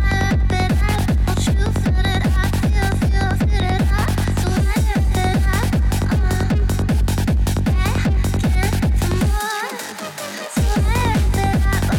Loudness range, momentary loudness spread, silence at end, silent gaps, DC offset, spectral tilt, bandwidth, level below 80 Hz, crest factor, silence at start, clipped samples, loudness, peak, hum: 2 LU; 2 LU; 0 s; none; under 0.1%; -6 dB/octave; 17.5 kHz; -20 dBFS; 10 dB; 0 s; under 0.1%; -19 LUFS; -6 dBFS; none